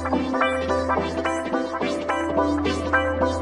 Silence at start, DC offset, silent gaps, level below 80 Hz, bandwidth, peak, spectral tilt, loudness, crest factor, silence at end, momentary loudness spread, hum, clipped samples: 0 s; under 0.1%; none; -44 dBFS; 11 kHz; -8 dBFS; -5.5 dB/octave; -23 LUFS; 16 dB; 0 s; 4 LU; none; under 0.1%